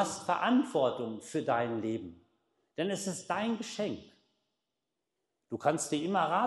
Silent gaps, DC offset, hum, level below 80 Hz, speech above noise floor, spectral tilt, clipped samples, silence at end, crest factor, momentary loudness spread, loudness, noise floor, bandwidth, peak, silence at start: none; under 0.1%; none; -76 dBFS; 55 dB; -4.5 dB/octave; under 0.1%; 0 s; 20 dB; 11 LU; -33 LUFS; -87 dBFS; 12 kHz; -14 dBFS; 0 s